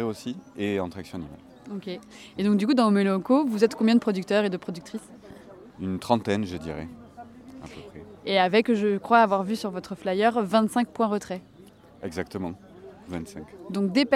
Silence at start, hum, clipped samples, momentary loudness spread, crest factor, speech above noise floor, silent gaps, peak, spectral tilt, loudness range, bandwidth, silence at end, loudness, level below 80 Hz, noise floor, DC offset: 0 s; none; under 0.1%; 21 LU; 20 dB; 26 dB; none; -6 dBFS; -6 dB/octave; 8 LU; 13.5 kHz; 0 s; -25 LUFS; -60 dBFS; -51 dBFS; under 0.1%